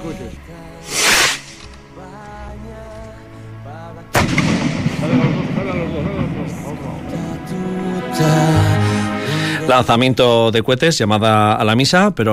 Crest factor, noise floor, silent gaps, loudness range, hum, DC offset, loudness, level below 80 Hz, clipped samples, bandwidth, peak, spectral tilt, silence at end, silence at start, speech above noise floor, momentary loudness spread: 14 dB; -36 dBFS; none; 8 LU; none; under 0.1%; -16 LUFS; -40 dBFS; under 0.1%; 16 kHz; -2 dBFS; -4.5 dB/octave; 0 s; 0 s; 21 dB; 22 LU